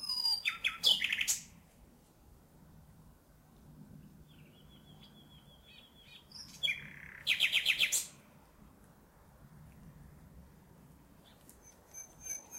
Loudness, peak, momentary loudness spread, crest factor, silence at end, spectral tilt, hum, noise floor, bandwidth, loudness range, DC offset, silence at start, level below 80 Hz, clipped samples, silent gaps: -31 LUFS; -16 dBFS; 28 LU; 24 dB; 0 s; 1 dB/octave; none; -62 dBFS; 16 kHz; 21 LU; under 0.1%; 0 s; -66 dBFS; under 0.1%; none